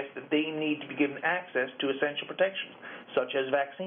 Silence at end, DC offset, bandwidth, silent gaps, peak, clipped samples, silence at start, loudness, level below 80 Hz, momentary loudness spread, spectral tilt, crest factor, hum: 0 s; under 0.1%; 3.7 kHz; none; -14 dBFS; under 0.1%; 0 s; -30 LUFS; -80 dBFS; 4 LU; -2 dB/octave; 18 dB; none